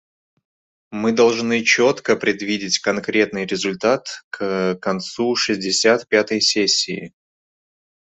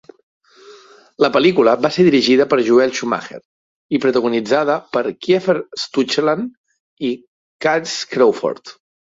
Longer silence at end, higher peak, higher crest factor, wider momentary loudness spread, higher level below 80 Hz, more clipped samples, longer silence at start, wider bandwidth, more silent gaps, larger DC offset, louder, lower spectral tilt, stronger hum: first, 0.95 s vs 0.35 s; about the same, -2 dBFS vs -2 dBFS; about the same, 18 dB vs 16 dB; second, 8 LU vs 11 LU; about the same, -62 dBFS vs -62 dBFS; neither; first, 0.9 s vs 0.7 s; about the same, 8.4 kHz vs 7.8 kHz; second, 4.24-4.31 s vs 3.45-3.89 s, 6.57-6.64 s, 6.80-6.97 s, 7.27-7.59 s; neither; about the same, -18 LUFS vs -16 LUFS; second, -3 dB/octave vs -5 dB/octave; neither